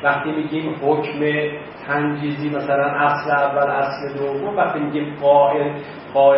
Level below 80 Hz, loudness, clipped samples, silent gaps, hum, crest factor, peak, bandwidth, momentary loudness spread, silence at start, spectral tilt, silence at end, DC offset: -60 dBFS; -20 LUFS; under 0.1%; none; none; 16 dB; -2 dBFS; 5.8 kHz; 8 LU; 0 s; -11 dB/octave; 0 s; under 0.1%